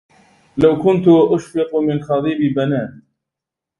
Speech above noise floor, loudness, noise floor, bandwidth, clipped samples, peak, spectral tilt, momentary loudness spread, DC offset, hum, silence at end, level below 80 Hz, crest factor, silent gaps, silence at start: 70 dB; -16 LUFS; -85 dBFS; 11 kHz; under 0.1%; 0 dBFS; -8 dB/octave; 9 LU; under 0.1%; none; 0.9 s; -50 dBFS; 16 dB; none; 0.55 s